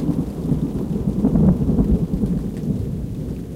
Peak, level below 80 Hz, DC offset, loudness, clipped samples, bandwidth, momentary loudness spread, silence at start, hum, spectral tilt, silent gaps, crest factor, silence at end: -4 dBFS; -28 dBFS; under 0.1%; -21 LUFS; under 0.1%; 15 kHz; 10 LU; 0 s; none; -10 dB/octave; none; 16 dB; 0 s